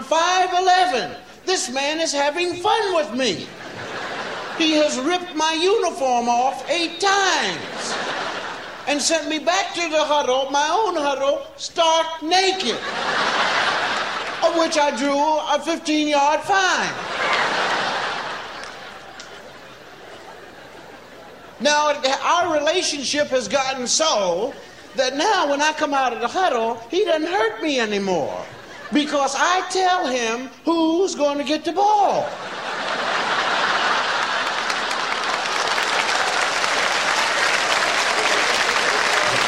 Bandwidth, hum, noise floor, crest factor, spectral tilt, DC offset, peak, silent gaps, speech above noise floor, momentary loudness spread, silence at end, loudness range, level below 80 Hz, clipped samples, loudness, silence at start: 16 kHz; none; -41 dBFS; 18 dB; -1.5 dB/octave; 0.2%; -2 dBFS; none; 21 dB; 12 LU; 0 s; 3 LU; -60 dBFS; under 0.1%; -20 LUFS; 0 s